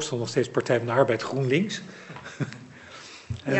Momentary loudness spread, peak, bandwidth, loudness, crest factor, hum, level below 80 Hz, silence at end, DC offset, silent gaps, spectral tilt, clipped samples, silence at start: 19 LU; -8 dBFS; 8.4 kHz; -26 LUFS; 20 dB; none; -60 dBFS; 0 s; under 0.1%; none; -5.5 dB/octave; under 0.1%; 0 s